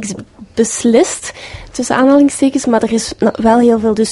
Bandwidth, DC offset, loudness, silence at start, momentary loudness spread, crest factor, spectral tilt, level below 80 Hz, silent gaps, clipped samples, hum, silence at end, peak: 11.5 kHz; under 0.1%; -12 LUFS; 0 s; 15 LU; 12 dB; -4.5 dB/octave; -42 dBFS; none; under 0.1%; none; 0 s; 0 dBFS